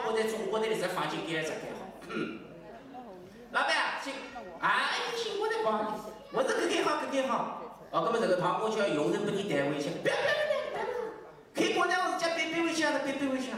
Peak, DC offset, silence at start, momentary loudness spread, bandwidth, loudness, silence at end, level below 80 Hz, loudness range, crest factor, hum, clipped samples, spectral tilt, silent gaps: -18 dBFS; under 0.1%; 0 s; 14 LU; 16 kHz; -31 LUFS; 0 s; -70 dBFS; 4 LU; 14 dB; none; under 0.1%; -4 dB/octave; none